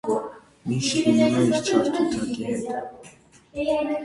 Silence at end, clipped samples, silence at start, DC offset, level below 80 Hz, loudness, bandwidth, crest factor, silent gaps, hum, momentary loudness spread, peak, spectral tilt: 0 s; under 0.1%; 0.05 s; under 0.1%; -56 dBFS; -23 LUFS; 11.5 kHz; 18 dB; none; none; 16 LU; -6 dBFS; -5 dB/octave